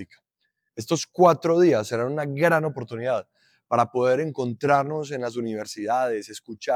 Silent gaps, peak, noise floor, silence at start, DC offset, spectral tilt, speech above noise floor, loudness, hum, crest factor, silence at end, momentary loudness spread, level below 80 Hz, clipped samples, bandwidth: none; -6 dBFS; -77 dBFS; 0 s; under 0.1%; -5.5 dB/octave; 54 dB; -23 LUFS; none; 18 dB; 0 s; 12 LU; -76 dBFS; under 0.1%; 15.5 kHz